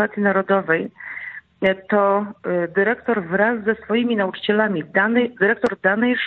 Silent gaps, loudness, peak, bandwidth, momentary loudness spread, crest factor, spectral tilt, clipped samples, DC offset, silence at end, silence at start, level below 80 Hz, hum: none; -19 LUFS; -4 dBFS; 6.2 kHz; 6 LU; 16 dB; -8 dB/octave; under 0.1%; under 0.1%; 0 s; 0 s; -60 dBFS; none